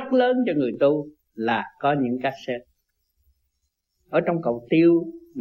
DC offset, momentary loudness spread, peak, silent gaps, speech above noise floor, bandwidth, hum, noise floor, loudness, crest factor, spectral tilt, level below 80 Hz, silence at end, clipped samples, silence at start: under 0.1%; 13 LU; -8 dBFS; none; 54 dB; 6.2 kHz; none; -76 dBFS; -23 LUFS; 16 dB; -8.5 dB/octave; -66 dBFS; 0 s; under 0.1%; 0 s